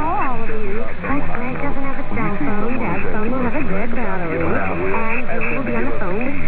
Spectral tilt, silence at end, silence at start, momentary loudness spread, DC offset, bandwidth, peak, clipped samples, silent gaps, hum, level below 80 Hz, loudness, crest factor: -10.5 dB/octave; 0 s; 0 s; 5 LU; under 0.1%; 4 kHz; -6 dBFS; under 0.1%; none; none; -28 dBFS; -22 LUFS; 8 dB